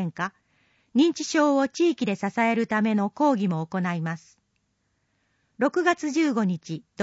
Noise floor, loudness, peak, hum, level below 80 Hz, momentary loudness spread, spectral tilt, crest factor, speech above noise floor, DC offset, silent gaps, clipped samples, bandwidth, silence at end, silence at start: -73 dBFS; -24 LUFS; -10 dBFS; none; -74 dBFS; 10 LU; -5.5 dB/octave; 16 dB; 49 dB; under 0.1%; none; under 0.1%; 8 kHz; 0 s; 0 s